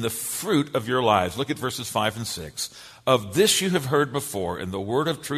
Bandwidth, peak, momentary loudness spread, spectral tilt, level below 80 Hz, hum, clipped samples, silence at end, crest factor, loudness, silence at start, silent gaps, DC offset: 14 kHz; -4 dBFS; 11 LU; -4 dB/octave; -56 dBFS; none; under 0.1%; 0 s; 20 dB; -24 LUFS; 0 s; none; under 0.1%